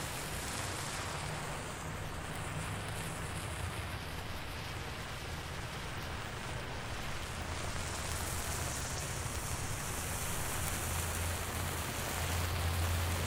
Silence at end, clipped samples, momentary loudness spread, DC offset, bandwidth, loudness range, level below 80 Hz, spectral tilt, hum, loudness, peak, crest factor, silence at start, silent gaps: 0 s; under 0.1%; 6 LU; under 0.1%; 16 kHz; 5 LU; -48 dBFS; -3.5 dB/octave; none; -38 LUFS; -16 dBFS; 22 dB; 0 s; none